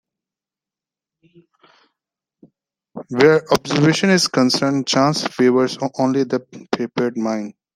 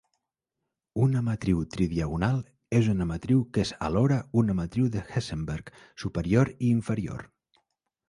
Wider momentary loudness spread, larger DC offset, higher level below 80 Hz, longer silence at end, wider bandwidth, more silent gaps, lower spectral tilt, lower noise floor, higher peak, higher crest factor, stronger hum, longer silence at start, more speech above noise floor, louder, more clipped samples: about the same, 12 LU vs 10 LU; neither; second, -60 dBFS vs -46 dBFS; second, 0.25 s vs 0.85 s; first, 16 kHz vs 11.5 kHz; neither; second, -5 dB/octave vs -7.5 dB/octave; first, -89 dBFS vs -85 dBFS; first, 0 dBFS vs -10 dBFS; about the same, 18 dB vs 18 dB; neither; first, 2.95 s vs 0.95 s; first, 72 dB vs 59 dB; first, -18 LUFS vs -27 LUFS; neither